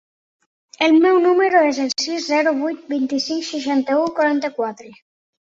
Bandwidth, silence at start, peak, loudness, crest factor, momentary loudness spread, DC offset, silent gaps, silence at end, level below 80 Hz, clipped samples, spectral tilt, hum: 7.8 kHz; 0.8 s; -2 dBFS; -18 LUFS; 16 dB; 9 LU; under 0.1%; none; 0.5 s; -68 dBFS; under 0.1%; -2.5 dB/octave; none